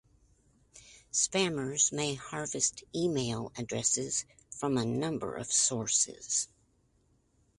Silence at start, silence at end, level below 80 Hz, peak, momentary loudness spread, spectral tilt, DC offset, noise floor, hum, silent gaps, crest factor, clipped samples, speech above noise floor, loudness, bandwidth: 0.75 s; 1.15 s; -64 dBFS; -14 dBFS; 10 LU; -3 dB/octave; under 0.1%; -70 dBFS; none; none; 20 dB; under 0.1%; 38 dB; -31 LUFS; 11.5 kHz